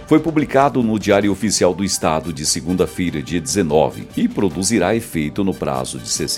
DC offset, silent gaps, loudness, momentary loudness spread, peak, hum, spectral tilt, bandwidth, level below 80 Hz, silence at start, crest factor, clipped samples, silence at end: under 0.1%; none; -18 LUFS; 6 LU; 0 dBFS; none; -4.5 dB/octave; 16.5 kHz; -42 dBFS; 0 s; 18 dB; under 0.1%; 0 s